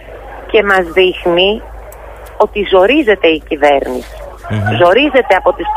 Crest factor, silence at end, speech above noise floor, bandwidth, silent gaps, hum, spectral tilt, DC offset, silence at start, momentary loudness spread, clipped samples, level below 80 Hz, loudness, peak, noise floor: 12 dB; 0 s; 20 dB; 15.5 kHz; none; none; -6 dB/octave; under 0.1%; 0 s; 21 LU; under 0.1%; -34 dBFS; -11 LUFS; 0 dBFS; -31 dBFS